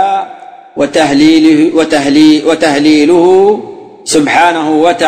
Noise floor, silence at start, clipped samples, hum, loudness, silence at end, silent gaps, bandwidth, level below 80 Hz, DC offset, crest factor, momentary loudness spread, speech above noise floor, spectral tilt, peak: -30 dBFS; 0 s; 0.8%; none; -8 LUFS; 0 s; none; 9.6 kHz; -48 dBFS; under 0.1%; 8 dB; 11 LU; 23 dB; -4 dB/octave; 0 dBFS